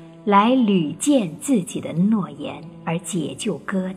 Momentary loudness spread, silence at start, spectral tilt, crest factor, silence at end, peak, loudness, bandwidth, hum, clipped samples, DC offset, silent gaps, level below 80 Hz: 12 LU; 0 s; -5.5 dB/octave; 18 dB; 0 s; -4 dBFS; -21 LUFS; 14.5 kHz; none; under 0.1%; under 0.1%; none; -62 dBFS